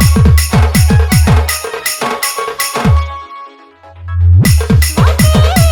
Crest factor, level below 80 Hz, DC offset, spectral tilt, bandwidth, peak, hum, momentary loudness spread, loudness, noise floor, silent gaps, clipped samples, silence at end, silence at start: 10 dB; -16 dBFS; under 0.1%; -5 dB/octave; 19 kHz; 0 dBFS; none; 13 LU; -10 LUFS; -37 dBFS; none; under 0.1%; 0 s; 0 s